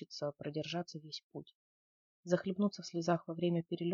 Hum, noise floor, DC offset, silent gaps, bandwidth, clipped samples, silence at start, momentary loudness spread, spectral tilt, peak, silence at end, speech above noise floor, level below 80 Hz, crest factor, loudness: none; under -90 dBFS; under 0.1%; 1.23-1.30 s, 1.55-2.23 s; 7.4 kHz; under 0.1%; 0 s; 11 LU; -6 dB/octave; -18 dBFS; 0 s; over 52 dB; -80 dBFS; 20 dB; -38 LUFS